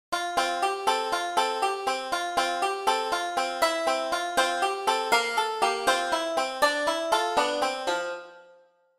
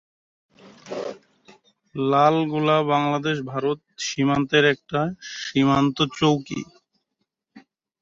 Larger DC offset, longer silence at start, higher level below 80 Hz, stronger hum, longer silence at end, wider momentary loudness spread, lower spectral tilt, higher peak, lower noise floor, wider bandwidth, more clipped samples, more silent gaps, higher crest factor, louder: neither; second, 0.1 s vs 0.65 s; about the same, -64 dBFS vs -60 dBFS; neither; first, 0.55 s vs 0.4 s; second, 5 LU vs 14 LU; second, -0.5 dB/octave vs -5.5 dB/octave; second, -8 dBFS vs -4 dBFS; second, -58 dBFS vs -78 dBFS; first, 16 kHz vs 7.8 kHz; neither; neither; about the same, 18 dB vs 18 dB; second, -26 LUFS vs -22 LUFS